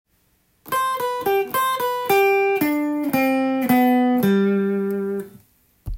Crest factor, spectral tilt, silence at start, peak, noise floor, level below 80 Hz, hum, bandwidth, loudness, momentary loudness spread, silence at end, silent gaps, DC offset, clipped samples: 14 dB; -5.5 dB/octave; 0.65 s; -6 dBFS; -63 dBFS; -46 dBFS; none; 17 kHz; -20 LUFS; 9 LU; 0 s; none; under 0.1%; under 0.1%